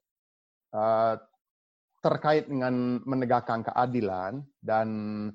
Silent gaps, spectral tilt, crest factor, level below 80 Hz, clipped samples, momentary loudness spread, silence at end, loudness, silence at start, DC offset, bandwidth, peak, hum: 1.41-1.88 s; -8.5 dB/octave; 18 dB; -70 dBFS; under 0.1%; 9 LU; 0 s; -28 LUFS; 0.75 s; under 0.1%; 7.2 kHz; -10 dBFS; none